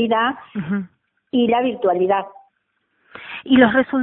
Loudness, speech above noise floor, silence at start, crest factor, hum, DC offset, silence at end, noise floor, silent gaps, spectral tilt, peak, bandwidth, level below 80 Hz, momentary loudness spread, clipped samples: -18 LUFS; 52 dB; 0 s; 20 dB; none; under 0.1%; 0 s; -70 dBFS; none; -10.5 dB/octave; 0 dBFS; 4 kHz; -58 dBFS; 20 LU; under 0.1%